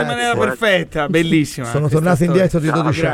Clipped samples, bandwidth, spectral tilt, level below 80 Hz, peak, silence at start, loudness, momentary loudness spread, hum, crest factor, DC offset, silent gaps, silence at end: under 0.1%; 15.5 kHz; -6 dB/octave; -40 dBFS; -2 dBFS; 0 s; -16 LUFS; 3 LU; none; 14 dB; under 0.1%; none; 0 s